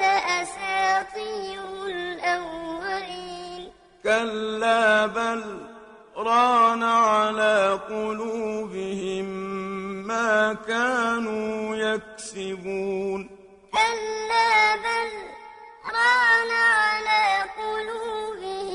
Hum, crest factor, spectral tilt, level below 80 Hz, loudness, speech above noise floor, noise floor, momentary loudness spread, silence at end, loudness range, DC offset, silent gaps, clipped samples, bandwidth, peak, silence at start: none; 18 dB; -3 dB/octave; -60 dBFS; -23 LUFS; 26 dB; -47 dBFS; 15 LU; 0 s; 6 LU; under 0.1%; none; under 0.1%; 11 kHz; -8 dBFS; 0 s